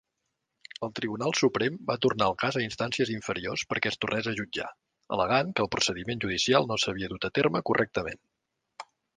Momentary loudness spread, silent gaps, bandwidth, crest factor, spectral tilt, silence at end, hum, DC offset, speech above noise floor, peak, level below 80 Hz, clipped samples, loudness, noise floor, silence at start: 11 LU; none; 10 kHz; 22 dB; -4 dB/octave; 0.35 s; none; under 0.1%; 53 dB; -8 dBFS; -58 dBFS; under 0.1%; -28 LUFS; -82 dBFS; 0.8 s